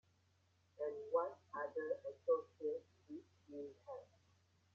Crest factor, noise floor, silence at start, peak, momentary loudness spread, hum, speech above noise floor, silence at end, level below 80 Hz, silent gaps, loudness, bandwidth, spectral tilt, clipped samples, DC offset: 20 dB; -77 dBFS; 0.8 s; -26 dBFS; 16 LU; none; 33 dB; 0.7 s; under -90 dBFS; none; -44 LUFS; 6.8 kHz; -5 dB/octave; under 0.1%; under 0.1%